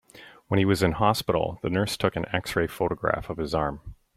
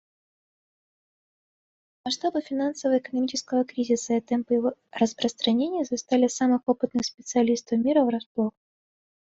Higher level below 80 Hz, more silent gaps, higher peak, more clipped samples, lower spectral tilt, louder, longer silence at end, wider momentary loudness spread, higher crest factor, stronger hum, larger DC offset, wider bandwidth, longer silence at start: first, -48 dBFS vs -68 dBFS; second, none vs 8.26-8.35 s; first, -6 dBFS vs -10 dBFS; neither; first, -5.5 dB/octave vs -4 dB/octave; about the same, -26 LUFS vs -25 LUFS; second, 0.2 s vs 0.9 s; about the same, 7 LU vs 6 LU; about the same, 20 dB vs 16 dB; neither; neither; first, 16 kHz vs 8 kHz; second, 0.15 s vs 2.05 s